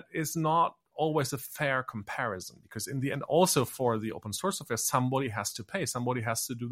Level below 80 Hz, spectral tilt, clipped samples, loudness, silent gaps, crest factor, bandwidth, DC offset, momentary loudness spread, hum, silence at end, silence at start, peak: -68 dBFS; -4 dB/octave; under 0.1%; -30 LUFS; none; 20 dB; 16 kHz; under 0.1%; 9 LU; none; 0 s; 0.1 s; -10 dBFS